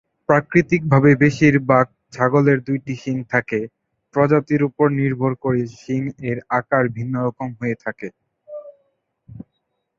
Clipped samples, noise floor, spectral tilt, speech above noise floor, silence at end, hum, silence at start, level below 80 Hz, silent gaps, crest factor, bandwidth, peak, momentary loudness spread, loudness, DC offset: under 0.1%; -74 dBFS; -8.5 dB/octave; 55 dB; 0.55 s; none; 0.3 s; -54 dBFS; none; 18 dB; 7.4 kHz; 0 dBFS; 13 LU; -19 LUFS; under 0.1%